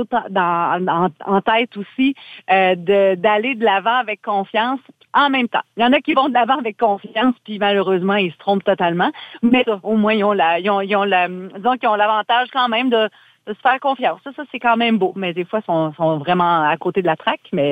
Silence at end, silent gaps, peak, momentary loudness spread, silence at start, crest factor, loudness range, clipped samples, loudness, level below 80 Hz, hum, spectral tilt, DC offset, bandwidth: 0 s; none; -2 dBFS; 6 LU; 0 s; 16 dB; 2 LU; under 0.1%; -17 LUFS; -64 dBFS; none; -7.5 dB/octave; under 0.1%; 8.2 kHz